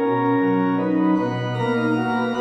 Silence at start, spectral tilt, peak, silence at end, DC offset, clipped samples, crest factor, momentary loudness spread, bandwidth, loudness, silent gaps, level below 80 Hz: 0 s; -8 dB/octave; -8 dBFS; 0 s; under 0.1%; under 0.1%; 12 dB; 3 LU; 8.8 kHz; -21 LUFS; none; -58 dBFS